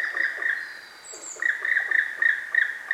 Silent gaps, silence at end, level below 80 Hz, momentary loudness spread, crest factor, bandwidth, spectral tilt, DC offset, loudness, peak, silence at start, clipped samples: none; 0 s; -72 dBFS; 17 LU; 18 dB; 15.5 kHz; 1.5 dB/octave; under 0.1%; -23 LUFS; -8 dBFS; 0 s; under 0.1%